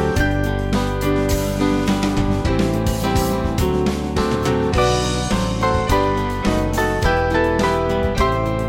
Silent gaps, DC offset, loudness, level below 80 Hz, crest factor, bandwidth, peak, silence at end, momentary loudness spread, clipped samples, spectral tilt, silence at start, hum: none; under 0.1%; -19 LUFS; -26 dBFS; 16 dB; 17 kHz; -2 dBFS; 0 s; 3 LU; under 0.1%; -5.5 dB/octave; 0 s; none